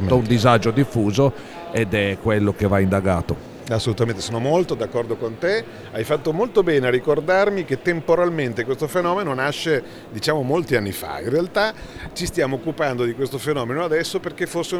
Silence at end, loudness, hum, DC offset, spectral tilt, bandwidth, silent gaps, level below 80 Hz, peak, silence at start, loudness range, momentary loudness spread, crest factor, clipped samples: 0 s; -21 LUFS; none; under 0.1%; -6 dB/octave; 20 kHz; none; -46 dBFS; -2 dBFS; 0 s; 3 LU; 8 LU; 20 dB; under 0.1%